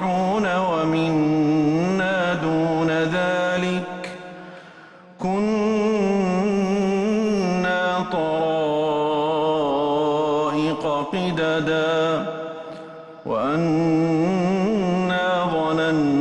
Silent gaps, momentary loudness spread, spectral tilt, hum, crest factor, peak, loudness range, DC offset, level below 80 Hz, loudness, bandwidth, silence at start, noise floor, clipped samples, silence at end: none; 9 LU; -6.5 dB/octave; none; 10 dB; -10 dBFS; 3 LU; under 0.1%; -56 dBFS; -21 LUFS; 10.5 kHz; 0 s; -45 dBFS; under 0.1%; 0 s